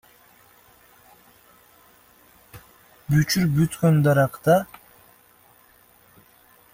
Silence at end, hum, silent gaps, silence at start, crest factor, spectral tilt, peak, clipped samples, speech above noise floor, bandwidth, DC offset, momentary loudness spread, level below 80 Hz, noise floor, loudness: 2.1 s; none; none; 2.55 s; 20 dB; -6 dB/octave; -6 dBFS; under 0.1%; 36 dB; 16.5 kHz; under 0.1%; 7 LU; -56 dBFS; -56 dBFS; -20 LUFS